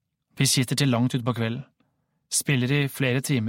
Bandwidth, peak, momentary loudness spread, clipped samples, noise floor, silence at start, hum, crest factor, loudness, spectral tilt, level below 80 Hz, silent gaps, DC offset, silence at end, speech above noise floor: 17 kHz; -8 dBFS; 6 LU; under 0.1%; -71 dBFS; 0.35 s; none; 18 dB; -24 LUFS; -4.5 dB/octave; -60 dBFS; none; under 0.1%; 0 s; 48 dB